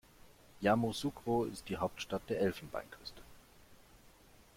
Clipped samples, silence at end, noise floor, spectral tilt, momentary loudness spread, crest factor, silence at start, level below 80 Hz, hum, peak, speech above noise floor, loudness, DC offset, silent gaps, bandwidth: under 0.1%; 0.8 s; -62 dBFS; -5.5 dB/octave; 17 LU; 22 dB; 0.25 s; -62 dBFS; none; -16 dBFS; 26 dB; -37 LUFS; under 0.1%; none; 16.5 kHz